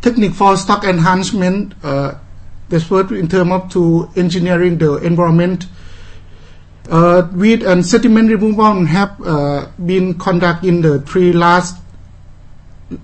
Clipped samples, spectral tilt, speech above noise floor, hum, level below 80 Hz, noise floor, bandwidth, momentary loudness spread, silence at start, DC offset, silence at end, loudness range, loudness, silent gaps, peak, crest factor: under 0.1%; -6.5 dB/octave; 24 dB; none; -36 dBFS; -36 dBFS; 8.8 kHz; 9 LU; 0 s; under 0.1%; 0 s; 3 LU; -13 LUFS; none; 0 dBFS; 14 dB